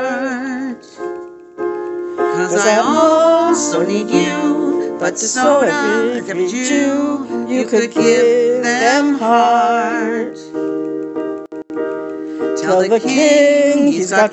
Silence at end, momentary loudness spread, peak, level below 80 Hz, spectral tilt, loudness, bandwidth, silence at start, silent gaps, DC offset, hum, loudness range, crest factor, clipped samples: 0 s; 13 LU; 0 dBFS; -64 dBFS; -3.5 dB/octave; -15 LUFS; 8.6 kHz; 0 s; none; under 0.1%; none; 4 LU; 14 dB; under 0.1%